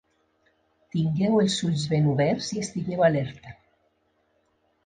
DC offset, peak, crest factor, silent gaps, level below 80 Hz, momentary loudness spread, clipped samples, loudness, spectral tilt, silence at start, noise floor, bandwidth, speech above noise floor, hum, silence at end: under 0.1%; -8 dBFS; 18 dB; none; -58 dBFS; 9 LU; under 0.1%; -25 LUFS; -6 dB/octave; 0.95 s; -69 dBFS; 9.6 kHz; 46 dB; none; 1.3 s